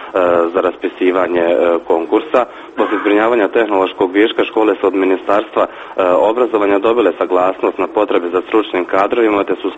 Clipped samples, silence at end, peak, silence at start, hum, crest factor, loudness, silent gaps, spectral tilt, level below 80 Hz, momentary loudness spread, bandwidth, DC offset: under 0.1%; 0 s; 0 dBFS; 0 s; none; 14 dB; -14 LUFS; none; -6 dB/octave; -54 dBFS; 4 LU; 8 kHz; under 0.1%